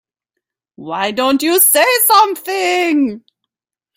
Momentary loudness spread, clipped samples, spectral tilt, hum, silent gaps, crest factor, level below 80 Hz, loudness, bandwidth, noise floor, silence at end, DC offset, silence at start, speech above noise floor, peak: 11 LU; under 0.1%; -1.5 dB/octave; none; none; 16 dB; -64 dBFS; -12 LUFS; 16.5 kHz; -86 dBFS; 0.8 s; under 0.1%; 0.8 s; 72 dB; 0 dBFS